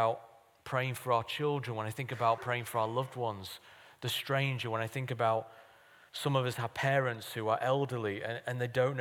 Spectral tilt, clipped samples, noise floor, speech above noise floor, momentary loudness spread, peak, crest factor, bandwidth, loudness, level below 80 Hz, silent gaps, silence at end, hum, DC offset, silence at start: -5.5 dB/octave; under 0.1%; -60 dBFS; 27 dB; 8 LU; -16 dBFS; 18 dB; 18.5 kHz; -34 LUFS; -76 dBFS; none; 0 s; none; under 0.1%; 0 s